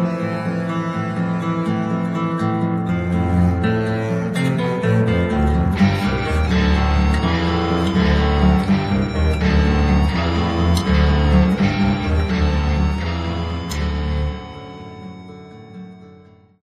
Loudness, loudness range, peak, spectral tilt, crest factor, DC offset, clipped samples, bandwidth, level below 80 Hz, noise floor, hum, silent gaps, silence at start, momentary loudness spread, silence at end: -19 LUFS; 5 LU; -2 dBFS; -7.5 dB/octave; 16 dB; under 0.1%; under 0.1%; 11.5 kHz; -24 dBFS; -46 dBFS; none; none; 0 s; 11 LU; 0.5 s